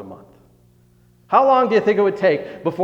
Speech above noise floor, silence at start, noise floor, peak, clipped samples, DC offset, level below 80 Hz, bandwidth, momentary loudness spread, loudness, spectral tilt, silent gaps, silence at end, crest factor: 38 dB; 0 s; -54 dBFS; 0 dBFS; under 0.1%; under 0.1%; -62 dBFS; 7.4 kHz; 7 LU; -17 LUFS; -7 dB/octave; none; 0 s; 18 dB